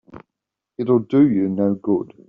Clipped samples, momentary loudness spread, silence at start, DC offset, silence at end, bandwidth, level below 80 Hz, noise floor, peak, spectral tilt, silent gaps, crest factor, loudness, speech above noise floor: under 0.1%; 10 LU; 0.15 s; under 0.1%; 0.25 s; 4.2 kHz; -62 dBFS; -84 dBFS; -4 dBFS; -9.5 dB/octave; none; 16 dB; -19 LUFS; 65 dB